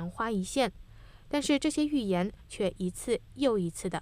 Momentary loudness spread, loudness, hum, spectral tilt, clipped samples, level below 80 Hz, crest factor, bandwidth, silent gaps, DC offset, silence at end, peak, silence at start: 6 LU; -31 LUFS; none; -5 dB/octave; under 0.1%; -52 dBFS; 18 dB; 15.5 kHz; none; under 0.1%; 0 s; -14 dBFS; 0 s